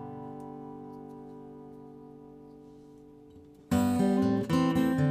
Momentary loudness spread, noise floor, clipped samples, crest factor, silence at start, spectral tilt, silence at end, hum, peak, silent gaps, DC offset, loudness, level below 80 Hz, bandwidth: 25 LU; -53 dBFS; under 0.1%; 16 dB; 0 s; -7 dB/octave; 0 s; none; -14 dBFS; none; under 0.1%; -27 LUFS; -62 dBFS; 15.5 kHz